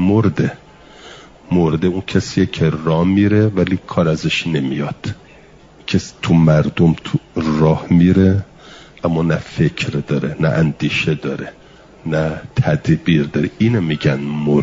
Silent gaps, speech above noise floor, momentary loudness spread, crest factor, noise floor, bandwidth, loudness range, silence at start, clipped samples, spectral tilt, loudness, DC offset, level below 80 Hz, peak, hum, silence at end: none; 28 dB; 9 LU; 14 dB; -44 dBFS; 7.8 kHz; 4 LU; 0 s; under 0.1%; -7 dB/octave; -16 LUFS; under 0.1%; -44 dBFS; -2 dBFS; none; 0 s